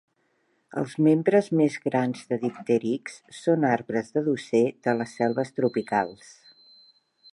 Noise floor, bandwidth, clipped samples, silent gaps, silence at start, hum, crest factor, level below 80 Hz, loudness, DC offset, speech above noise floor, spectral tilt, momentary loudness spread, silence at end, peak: -70 dBFS; 11.5 kHz; under 0.1%; none; 0.75 s; none; 18 dB; -72 dBFS; -25 LUFS; under 0.1%; 45 dB; -7 dB/octave; 10 LU; 1.2 s; -8 dBFS